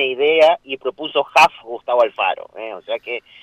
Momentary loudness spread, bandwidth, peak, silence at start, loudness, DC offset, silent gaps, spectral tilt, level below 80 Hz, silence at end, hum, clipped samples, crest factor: 15 LU; 15.5 kHz; -4 dBFS; 0 s; -17 LUFS; under 0.1%; none; -2.5 dB/octave; -62 dBFS; 0.25 s; none; under 0.1%; 14 dB